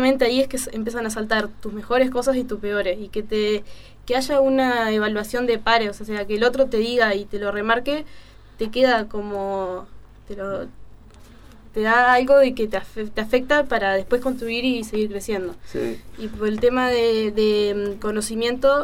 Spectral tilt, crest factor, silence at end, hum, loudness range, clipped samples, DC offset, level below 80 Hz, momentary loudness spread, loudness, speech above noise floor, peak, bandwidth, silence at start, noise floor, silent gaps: -4 dB/octave; 20 dB; 0 s; none; 5 LU; under 0.1%; under 0.1%; -44 dBFS; 11 LU; -21 LUFS; 24 dB; -2 dBFS; 16.5 kHz; 0 s; -45 dBFS; none